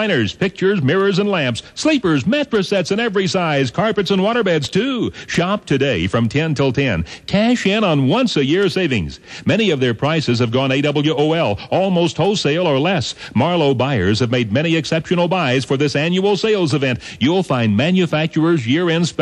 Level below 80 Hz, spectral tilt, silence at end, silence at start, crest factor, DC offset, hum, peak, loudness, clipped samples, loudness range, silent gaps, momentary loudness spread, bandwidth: -46 dBFS; -6 dB/octave; 0 s; 0 s; 14 dB; under 0.1%; none; -4 dBFS; -17 LUFS; under 0.1%; 1 LU; none; 4 LU; 11 kHz